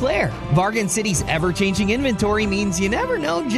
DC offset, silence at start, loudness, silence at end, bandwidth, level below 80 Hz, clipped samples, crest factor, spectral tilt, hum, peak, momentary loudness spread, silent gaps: under 0.1%; 0 s; -20 LUFS; 0 s; 14 kHz; -36 dBFS; under 0.1%; 14 dB; -4.5 dB/octave; none; -6 dBFS; 2 LU; none